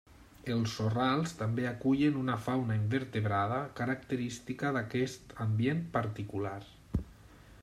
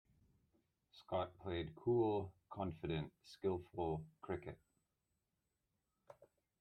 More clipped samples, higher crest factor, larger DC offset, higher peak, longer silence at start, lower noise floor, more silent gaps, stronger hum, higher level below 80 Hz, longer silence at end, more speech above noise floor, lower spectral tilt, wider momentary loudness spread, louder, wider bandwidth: neither; about the same, 16 dB vs 18 dB; neither; first, -18 dBFS vs -28 dBFS; second, 0.1 s vs 0.95 s; second, -55 dBFS vs -88 dBFS; neither; neither; first, -56 dBFS vs -70 dBFS; second, 0 s vs 0.35 s; second, 23 dB vs 46 dB; second, -6.5 dB/octave vs -8.5 dB/octave; second, 9 LU vs 12 LU; first, -33 LUFS vs -43 LUFS; first, 13 kHz vs 9.2 kHz